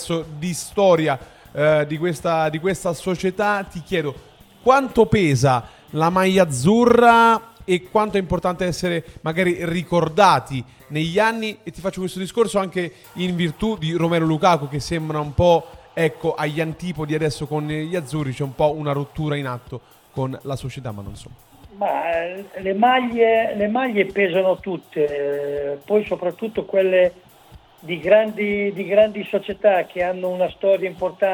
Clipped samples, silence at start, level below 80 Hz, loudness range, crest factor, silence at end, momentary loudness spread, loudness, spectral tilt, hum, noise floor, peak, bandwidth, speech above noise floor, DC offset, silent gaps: under 0.1%; 0 s; -48 dBFS; 7 LU; 20 dB; 0 s; 11 LU; -20 LUFS; -6 dB/octave; none; -47 dBFS; 0 dBFS; 19 kHz; 28 dB; under 0.1%; none